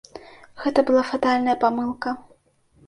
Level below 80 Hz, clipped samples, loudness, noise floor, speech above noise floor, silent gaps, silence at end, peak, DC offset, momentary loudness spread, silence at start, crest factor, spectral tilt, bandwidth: -60 dBFS; under 0.1%; -22 LUFS; -59 dBFS; 39 dB; none; 0.65 s; -4 dBFS; under 0.1%; 16 LU; 0.15 s; 18 dB; -5 dB/octave; 11 kHz